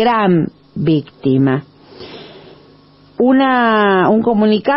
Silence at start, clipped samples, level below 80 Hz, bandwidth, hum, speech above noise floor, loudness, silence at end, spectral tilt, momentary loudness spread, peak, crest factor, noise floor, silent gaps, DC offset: 0 s; under 0.1%; -52 dBFS; 5.8 kHz; none; 33 dB; -14 LUFS; 0 s; -11.5 dB/octave; 18 LU; -2 dBFS; 12 dB; -45 dBFS; none; under 0.1%